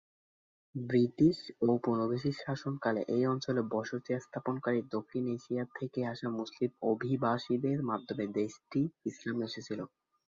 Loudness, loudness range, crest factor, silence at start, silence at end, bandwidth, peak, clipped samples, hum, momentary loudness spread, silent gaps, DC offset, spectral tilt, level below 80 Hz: -34 LUFS; 4 LU; 18 dB; 0.75 s; 0.5 s; 7.6 kHz; -16 dBFS; under 0.1%; none; 8 LU; none; under 0.1%; -7.5 dB/octave; -72 dBFS